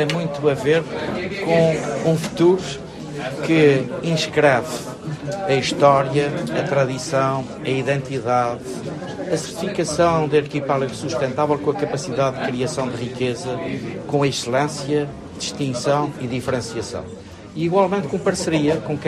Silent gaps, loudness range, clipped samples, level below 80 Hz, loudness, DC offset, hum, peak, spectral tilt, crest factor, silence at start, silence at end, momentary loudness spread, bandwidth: none; 4 LU; under 0.1%; -52 dBFS; -21 LUFS; under 0.1%; none; -2 dBFS; -5.5 dB/octave; 20 dB; 0 s; 0 s; 12 LU; 13.5 kHz